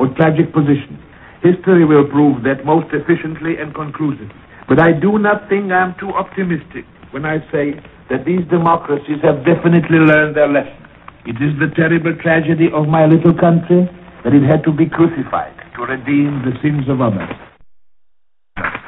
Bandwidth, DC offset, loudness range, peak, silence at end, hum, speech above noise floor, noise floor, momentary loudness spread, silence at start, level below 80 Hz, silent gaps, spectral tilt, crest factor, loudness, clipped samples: 4 kHz; under 0.1%; 5 LU; 0 dBFS; 0.05 s; none; 46 dB; -59 dBFS; 13 LU; 0 s; -46 dBFS; none; -11 dB/octave; 14 dB; -14 LUFS; under 0.1%